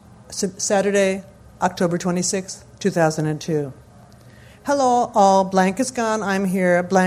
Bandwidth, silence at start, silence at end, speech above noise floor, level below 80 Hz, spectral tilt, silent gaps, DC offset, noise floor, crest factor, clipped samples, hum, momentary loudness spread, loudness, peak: 15 kHz; 0.3 s; 0 s; 27 dB; -54 dBFS; -5 dB/octave; none; under 0.1%; -46 dBFS; 18 dB; under 0.1%; none; 11 LU; -20 LUFS; -2 dBFS